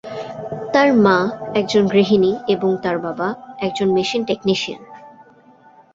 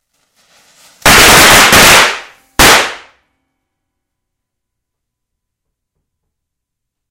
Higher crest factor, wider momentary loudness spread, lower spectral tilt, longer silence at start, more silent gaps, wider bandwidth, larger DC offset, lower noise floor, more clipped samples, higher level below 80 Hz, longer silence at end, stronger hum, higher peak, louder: first, 18 dB vs 12 dB; about the same, 14 LU vs 16 LU; first, -6 dB/octave vs -1.5 dB/octave; second, 0.05 s vs 1.05 s; neither; second, 7.8 kHz vs over 20 kHz; neither; second, -48 dBFS vs -77 dBFS; second, under 0.1% vs 2%; second, -58 dBFS vs -30 dBFS; second, 0.85 s vs 4.15 s; neither; about the same, 0 dBFS vs 0 dBFS; second, -18 LUFS vs -4 LUFS